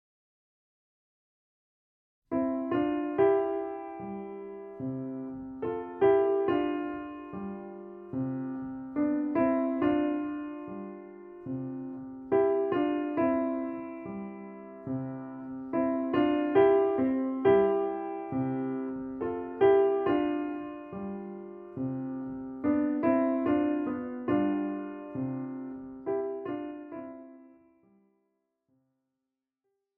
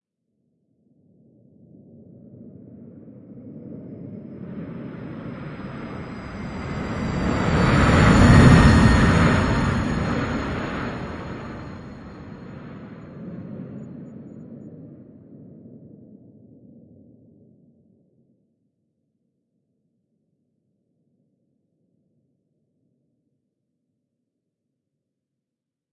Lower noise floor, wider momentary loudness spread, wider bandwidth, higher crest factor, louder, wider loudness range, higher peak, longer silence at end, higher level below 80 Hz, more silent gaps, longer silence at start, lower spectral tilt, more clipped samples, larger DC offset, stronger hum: about the same, -87 dBFS vs -86 dBFS; second, 16 LU vs 26 LU; second, 3.4 kHz vs 11.5 kHz; about the same, 20 dB vs 24 dB; second, -30 LUFS vs -18 LUFS; second, 7 LU vs 24 LU; second, -12 dBFS vs -2 dBFS; second, 2.5 s vs 10.15 s; second, -66 dBFS vs -34 dBFS; neither; about the same, 2.3 s vs 2.4 s; about the same, -6.5 dB/octave vs -6.5 dB/octave; neither; neither; neither